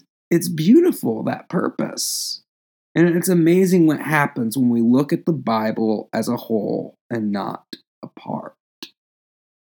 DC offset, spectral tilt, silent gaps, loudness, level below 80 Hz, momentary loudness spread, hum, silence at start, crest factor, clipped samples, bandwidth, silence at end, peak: under 0.1%; -5.5 dB/octave; 2.49-2.95 s, 7.01-7.10 s, 7.87-8.02 s, 8.60-8.82 s; -19 LUFS; -82 dBFS; 17 LU; none; 0.3 s; 18 dB; under 0.1%; over 20 kHz; 0.75 s; -2 dBFS